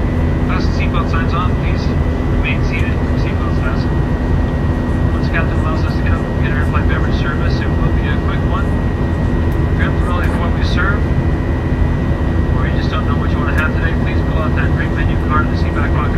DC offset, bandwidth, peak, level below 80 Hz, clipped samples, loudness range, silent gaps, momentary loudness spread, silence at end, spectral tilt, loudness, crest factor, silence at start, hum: under 0.1%; 7.6 kHz; 0 dBFS; -20 dBFS; under 0.1%; 1 LU; none; 2 LU; 0 s; -8 dB/octave; -16 LUFS; 14 dB; 0 s; none